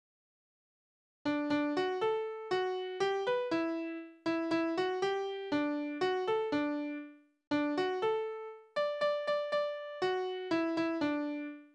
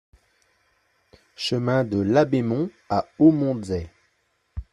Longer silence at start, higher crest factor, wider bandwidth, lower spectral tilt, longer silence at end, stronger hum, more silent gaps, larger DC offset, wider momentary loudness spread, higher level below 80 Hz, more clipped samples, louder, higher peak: second, 1.25 s vs 1.4 s; second, 14 dB vs 20 dB; second, 9.2 kHz vs 10.5 kHz; second, -5 dB/octave vs -7 dB/octave; about the same, 0.1 s vs 0.1 s; neither; first, 7.47-7.51 s vs none; neither; second, 7 LU vs 14 LU; second, -76 dBFS vs -50 dBFS; neither; second, -34 LUFS vs -22 LUFS; second, -20 dBFS vs -4 dBFS